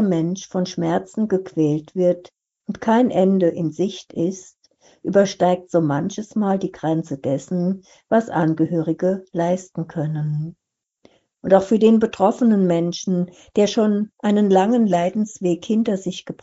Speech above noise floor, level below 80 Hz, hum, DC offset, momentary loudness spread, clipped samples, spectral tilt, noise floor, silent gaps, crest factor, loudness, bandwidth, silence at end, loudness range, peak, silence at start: 38 dB; -62 dBFS; none; under 0.1%; 9 LU; under 0.1%; -7 dB/octave; -57 dBFS; none; 18 dB; -20 LUFS; 8 kHz; 0.1 s; 4 LU; 0 dBFS; 0 s